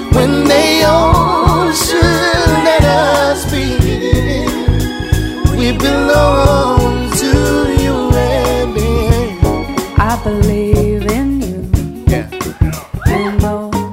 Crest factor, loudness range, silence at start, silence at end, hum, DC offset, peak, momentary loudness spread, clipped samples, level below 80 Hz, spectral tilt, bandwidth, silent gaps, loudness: 12 dB; 5 LU; 0 s; 0 s; none; under 0.1%; 0 dBFS; 7 LU; 0.3%; -20 dBFS; -5.5 dB/octave; 16.5 kHz; none; -12 LUFS